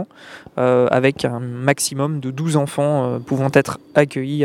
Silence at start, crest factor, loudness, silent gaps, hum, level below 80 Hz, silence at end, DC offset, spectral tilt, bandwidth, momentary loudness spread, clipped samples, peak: 0 s; 18 dB; -19 LUFS; none; none; -58 dBFS; 0 s; under 0.1%; -5.5 dB/octave; 16 kHz; 7 LU; under 0.1%; 0 dBFS